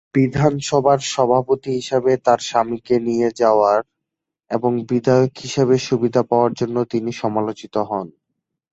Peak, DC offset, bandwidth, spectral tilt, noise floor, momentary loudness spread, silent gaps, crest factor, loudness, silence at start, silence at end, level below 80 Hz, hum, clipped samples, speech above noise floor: -2 dBFS; under 0.1%; 8.2 kHz; -6 dB/octave; -82 dBFS; 7 LU; none; 16 dB; -18 LUFS; 0.15 s; 0.6 s; -54 dBFS; none; under 0.1%; 64 dB